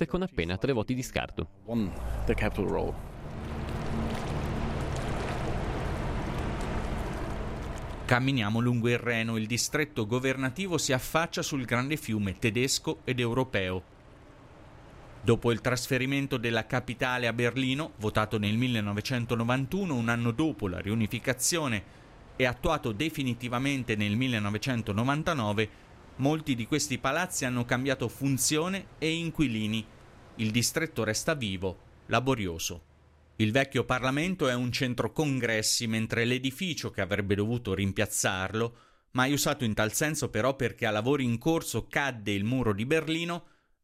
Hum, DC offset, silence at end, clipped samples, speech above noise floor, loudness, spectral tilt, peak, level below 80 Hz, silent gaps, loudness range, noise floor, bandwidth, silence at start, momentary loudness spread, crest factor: none; under 0.1%; 0.4 s; under 0.1%; 30 dB; -30 LUFS; -4.5 dB/octave; -8 dBFS; -46 dBFS; none; 4 LU; -59 dBFS; 16 kHz; 0 s; 7 LU; 22 dB